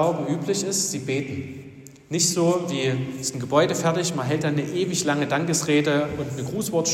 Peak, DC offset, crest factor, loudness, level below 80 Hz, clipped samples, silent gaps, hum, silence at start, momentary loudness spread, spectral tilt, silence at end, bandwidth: -6 dBFS; under 0.1%; 18 dB; -23 LUFS; -60 dBFS; under 0.1%; none; none; 0 s; 9 LU; -4 dB/octave; 0 s; 16.5 kHz